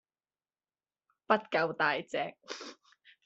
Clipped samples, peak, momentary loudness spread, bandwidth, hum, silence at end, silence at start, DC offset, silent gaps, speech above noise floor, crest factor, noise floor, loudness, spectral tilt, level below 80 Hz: under 0.1%; -10 dBFS; 15 LU; 8.2 kHz; none; 0.5 s; 1.3 s; under 0.1%; none; over 57 dB; 26 dB; under -90 dBFS; -32 LUFS; -4 dB/octave; -80 dBFS